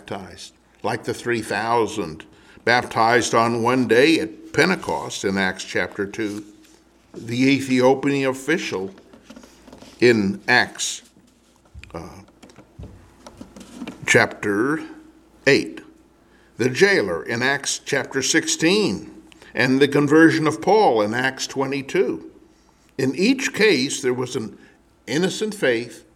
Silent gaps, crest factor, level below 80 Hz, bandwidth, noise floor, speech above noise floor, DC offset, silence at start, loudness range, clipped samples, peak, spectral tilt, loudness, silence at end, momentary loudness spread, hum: none; 20 dB; -56 dBFS; 15.5 kHz; -55 dBFS; 35 dB; under 0.1%; 0.05 s; 6 LU; under 0.1%; 0 dBFS; -4 dB/octave; -20 LUFS; 0.15 s; 17 LU; none